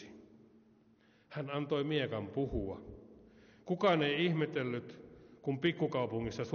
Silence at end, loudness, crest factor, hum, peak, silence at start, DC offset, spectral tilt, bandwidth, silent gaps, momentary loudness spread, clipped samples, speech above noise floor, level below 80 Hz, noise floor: 0 s; -35 LUFS; 18 dB; none; -18 dBFS; 0 s; under 0.1%; -4.5 dB/octave; 6.8 kHz; none; 22 LU; under 0.1%; 32 dB; -58 dBFS; -67 dBFS